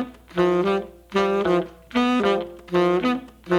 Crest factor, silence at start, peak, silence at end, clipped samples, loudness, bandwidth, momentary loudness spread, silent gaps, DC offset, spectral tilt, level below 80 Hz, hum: 14 dB; 0 s; -8 dBFS; 0 s; under 0.1%; -23 LUFS; 12 kHz; 7 LU; none; under 0.1%; -6.5 dB/octave; -52 dBFS; none